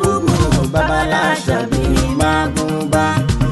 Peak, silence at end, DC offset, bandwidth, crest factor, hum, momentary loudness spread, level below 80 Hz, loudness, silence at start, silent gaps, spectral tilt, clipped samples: -4 dBFS; 0 s; 0.5%; 12.5 kHz; 12 dB; none; 3 LU; -24 dBFS; -16 LUFS; 0 s; none; -5.5 dB/octave; under 0.1%